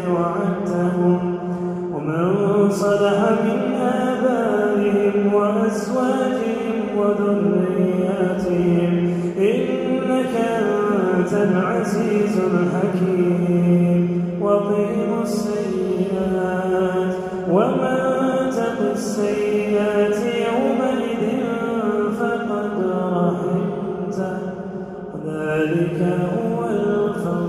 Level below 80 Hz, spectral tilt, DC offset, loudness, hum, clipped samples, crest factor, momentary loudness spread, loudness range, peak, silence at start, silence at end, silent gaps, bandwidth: -54 dBFS; -7.5 dB/octave; under 0.1%; -20 LUFS; none; under 0.1%; 16 dB; 5 LU; 4 LU; -4 dBFS; 0 s; 0 s; none; 12.5 kHz